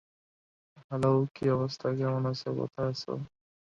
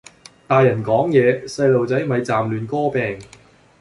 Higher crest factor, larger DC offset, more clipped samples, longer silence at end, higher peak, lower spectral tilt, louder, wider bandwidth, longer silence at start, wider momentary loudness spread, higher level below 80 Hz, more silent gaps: about the same, 18 dB vs 16 dB; neither; neither; second, 0.4 s vs 0.55 s; second, -14 dBFS vs -2 dBFS; about the same, -7.5 dB/octave vs -7 dB/octave; second, -31 LUFS vs -18 LUFS; second, 8.8 kHz vs 11.5 kHz; first, 0.75 s vs 0.5 s; first, 11 LU vs 7 LU; second, -64 dBFS vs -54 dBFS; first, 0.84-0.89 s, 1.31-1.35 s vs none